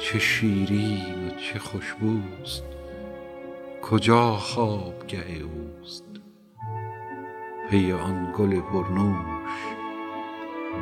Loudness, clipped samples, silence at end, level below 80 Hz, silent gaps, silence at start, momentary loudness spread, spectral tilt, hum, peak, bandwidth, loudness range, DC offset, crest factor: -27 LUFS; under 0.1%; 0 s; -50 dBFS; none; 0 s; 17 LU; -6 dB/octave; none; -2 dBFS; 14.5 kHz; 5 LU; under 0.1%; 24 dB